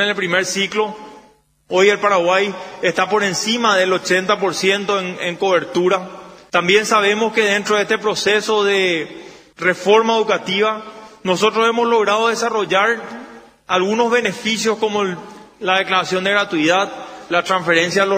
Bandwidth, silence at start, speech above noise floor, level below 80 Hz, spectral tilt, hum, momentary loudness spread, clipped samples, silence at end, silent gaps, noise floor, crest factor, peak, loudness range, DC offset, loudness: 16 kHz; 0 s; 35 dB; -62 dBFS; -3 dB/octave; none; 9 LU; under 0.1%; 0 s; none; -51 dBFS; 18 dB; 0 dBFS; 2 LU; under 0.1%; -16 LUFS